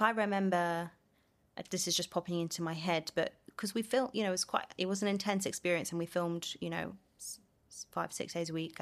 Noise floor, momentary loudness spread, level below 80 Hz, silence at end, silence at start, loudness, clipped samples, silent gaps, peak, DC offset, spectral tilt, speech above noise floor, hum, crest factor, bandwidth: -72 dBFS; 13 LU; -74 dBFS; 0 s; 0 s; -35 LUFS; under 0.1%; none; -14 dBFS; under 0.1%; -4 dB/octave; 37 dB; none; 22 dB; 15 kHz